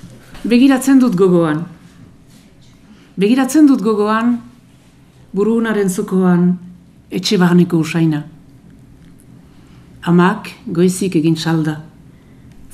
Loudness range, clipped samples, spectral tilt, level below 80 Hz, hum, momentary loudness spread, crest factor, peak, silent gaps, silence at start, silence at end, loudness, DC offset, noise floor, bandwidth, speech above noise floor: 3 LU; under 0.1%; -6.5 dB/octave; -50 dBFS; none; 14 LU; 16 dB; 0 dBFS; none; 0.05 s; 0.85 s; -14 LUFS; under 0.1%; -45 dBFS; 15 kHz; 33 dB